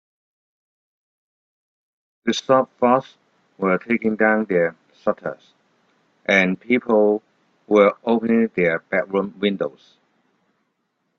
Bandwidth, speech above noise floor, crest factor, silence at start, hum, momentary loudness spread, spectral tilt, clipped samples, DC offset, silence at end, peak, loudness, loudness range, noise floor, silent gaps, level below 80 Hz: 7.6 kHz; 53 dB; 20 dB; 2.25 s; none; 10 LU; -6 dB/octave; under 0.1%; under 0.1%; 1.5 s; -2 dBFS; -20 LUFS; 4 LU; -72 dBFS; none; -66 dBFS